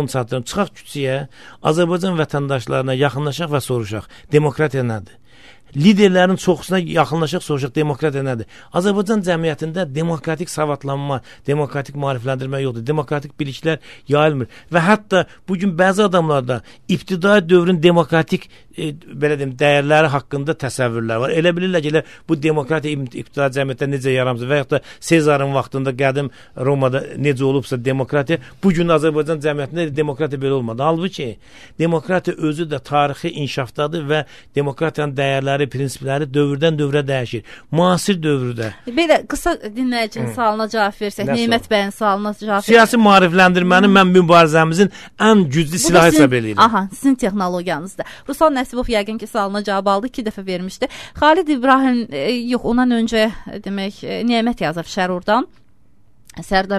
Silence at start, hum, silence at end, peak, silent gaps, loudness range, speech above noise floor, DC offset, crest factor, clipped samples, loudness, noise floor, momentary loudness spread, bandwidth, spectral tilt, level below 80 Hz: 0 s; none; 0 s; 0 dBFS; none; 8 LU; 39 dB; 0.5%; 16 dB; under 0.1%; -17 LUFS; -56 dBFS; 11 LU; 13.5 kHz; -5.5 dB/octave; -46 dBFS